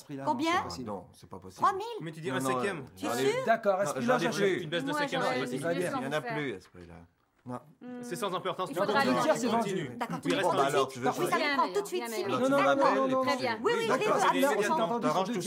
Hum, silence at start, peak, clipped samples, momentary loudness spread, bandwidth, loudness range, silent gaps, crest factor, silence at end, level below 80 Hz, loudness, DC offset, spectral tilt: none; 0.1 s; -12 dBFS; under 0.1%; 13 LU; 16 kHz; 6 LU; none; 18 dB; 0 s; -76 dBFS; -29 LUFS; under 0.1%; -4.5 dB/octave